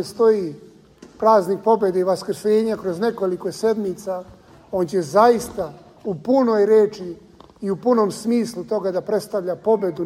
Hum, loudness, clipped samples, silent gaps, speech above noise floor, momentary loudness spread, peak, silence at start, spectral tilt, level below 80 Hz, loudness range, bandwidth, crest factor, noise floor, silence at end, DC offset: none; -20 LUFS; under 0.1%; none; 27 dB; 14 LU; -2 dBFS; 0 s; -6 dB/octave; -58 dBFS; 2 LU; 15.5 kHz; 18 dB; -46 dBFS; 0 s; under 0.1%